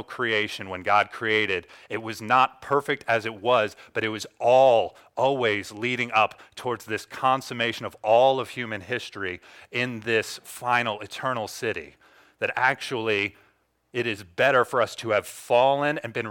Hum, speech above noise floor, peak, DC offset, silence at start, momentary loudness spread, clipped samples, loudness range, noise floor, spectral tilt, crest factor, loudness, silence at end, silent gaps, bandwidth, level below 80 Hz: none; 39 dB; -6 dBFS; under 0.1%; 0 s; 12 LU; under 0.1%; 5 LU; -64 dBFS; -4 dB/octave; 20 dB; -25 LUFS; 0 s; none; 18 kHz; -68 dBFS